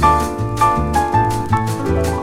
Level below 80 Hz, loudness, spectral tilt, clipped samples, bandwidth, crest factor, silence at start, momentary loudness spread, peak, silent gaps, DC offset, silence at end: -28 dBFS; -17 LUFS; -6 dB/octave; under 0.1%; 16 kHz; 14 dB; 0 s; 4 LU; -2 dBFS; none; under 0.1%; 0 s